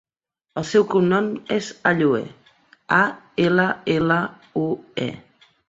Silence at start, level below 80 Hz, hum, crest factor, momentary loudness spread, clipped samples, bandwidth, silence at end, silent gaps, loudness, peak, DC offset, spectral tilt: 0.55 s; -60 dBFS; none; 20 dB; 10 LU; under 0.1%; 7.8 kHz; 0.5 s; none; -21 LUFS; -2 dBFS; under 0.1%; -6 dB/octave